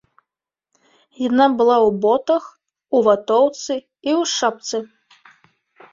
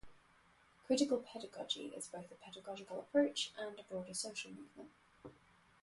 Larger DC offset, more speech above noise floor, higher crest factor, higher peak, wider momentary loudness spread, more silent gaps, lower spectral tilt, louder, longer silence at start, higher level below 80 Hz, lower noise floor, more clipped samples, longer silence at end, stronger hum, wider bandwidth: neither; first, 67 dB vs 28 dB; about the same, 18 dB vs 22 dB; first, -2 dBFS vs -22 dBFS; second, 12 LU vs 24 LU; neither; about the same, -4 dB/octave vs -3 dB/octave; first, -18 LUFS vs -41 LUFS; first, 1.2 s vs 0.05 s; first, -62 dBFS vs -78 dBFS; first, -85 dBFS vs -69 dBFS; neither; first, 1.05 s vs 0.5 s; neither; second, 7.6 kHz vs 11.5 kHz